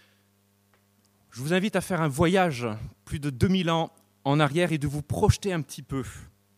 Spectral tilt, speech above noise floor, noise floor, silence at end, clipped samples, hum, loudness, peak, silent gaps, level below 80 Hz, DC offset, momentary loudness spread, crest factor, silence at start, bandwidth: -6 dB/octave; 40 dB; -66 dBFS; 0.35 s; under 0.1%; 50 Hz at -50 dBFS; -26 LUFS; -6 dBFS; none; -44 dBFS; under 0.1%; 14 LU; 20 dB; 1.35 s; 15.5 kHz